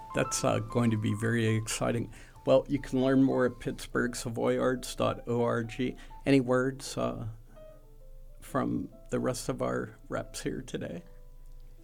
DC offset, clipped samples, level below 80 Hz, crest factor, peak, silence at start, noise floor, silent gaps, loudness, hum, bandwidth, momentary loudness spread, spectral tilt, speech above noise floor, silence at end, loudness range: under 0.1%; under 0.1%; -48 dBFS; 18 dB; -12 dBFS; 0 s; -50 dBFS; none; -30 LUFS; none; 18 kHz; 11 LU; -5.5 dB/octave; 20 dB; 0 s; 7 LU